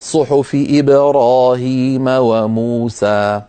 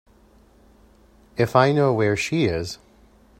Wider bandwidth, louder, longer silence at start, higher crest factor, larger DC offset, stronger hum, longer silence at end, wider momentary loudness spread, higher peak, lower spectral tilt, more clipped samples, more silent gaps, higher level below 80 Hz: second, 9.2 kHz vs 16 kHz; first, -13 LUFS vs -20 LUFS; second, 0 s vs 1.35 s; second, 12 dB vs 24 dB; neither; neither; second, 0.05 s vs 0.65 s; second, 6 LU vs 17 LU; about the same, -2 dBFS vs 0 dBFS; about the same, -6.5 dB/octave vs -6 dB/octave; neither; neither; about the same, -54 dBFS vs -52 dBFS